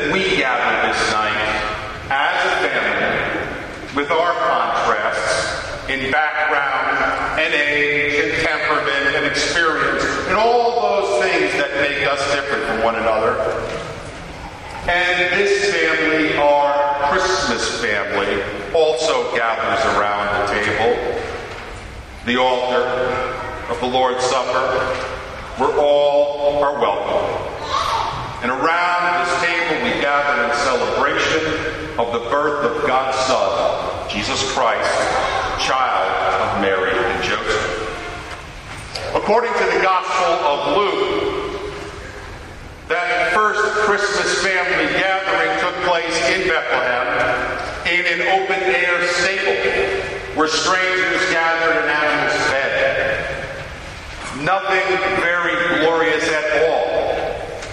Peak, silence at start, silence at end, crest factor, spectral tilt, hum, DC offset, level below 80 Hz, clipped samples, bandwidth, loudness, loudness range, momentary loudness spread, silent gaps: -2 dBFS; 0 s; 0 s; 16 dB; -3 dB/octave; none; under 0.1%; -42 dBFS; under 0.1%; 12 kHz; -18 LUFS; 3 LU; 10 LU; none